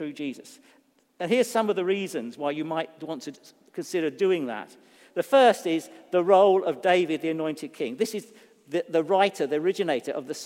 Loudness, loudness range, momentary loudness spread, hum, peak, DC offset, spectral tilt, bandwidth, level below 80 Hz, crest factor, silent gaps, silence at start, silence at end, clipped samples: -25 LUFS; 6 LU; 17 LU; none; -6 dBFS; under 0.1%; -4.5 dB/octave; 16 kHz; -84 dBFS; 20 dB; none; 0 s; 0 s; under 0.1%